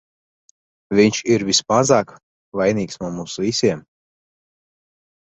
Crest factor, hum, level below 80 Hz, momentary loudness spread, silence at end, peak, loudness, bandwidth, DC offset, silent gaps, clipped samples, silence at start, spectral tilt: 18 dB; none; -56 dBFS; 12 LU; 1.5 s; -2 dBFS; -18 LUFS; 8.2 kHz; under 0.1%; 2.23-2.52 s; under 0.1%; 0.9 s; -4 dB/octave